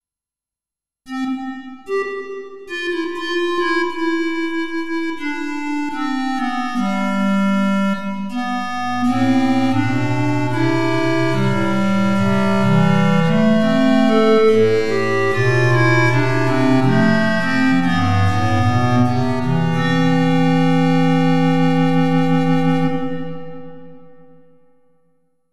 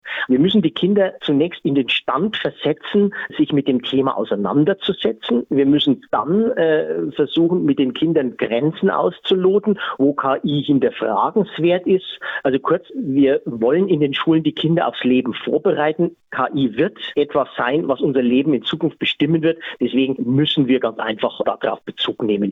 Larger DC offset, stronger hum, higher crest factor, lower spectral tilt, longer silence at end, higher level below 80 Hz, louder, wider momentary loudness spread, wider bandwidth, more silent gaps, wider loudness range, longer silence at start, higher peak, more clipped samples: first, 5% vs under 0.1%; neither; about the same, 14 dB vs 12 dB; second, -7 dB/octave vs -8.5 dB/octave; about the same, 0 s vs 0 s; about the same, -56 dBFS vs -60 dBFS; about the same, -17 LUFS vs -18 LUFS; first, 9 LU vs 5 LU; first, 12.5 kHz vs 4.2 kHz; neither; first, 7 LU vs 1 LU; about the same, 0 s vs 0.05 s; first, -2 dBFS vs -6 dBFS; neither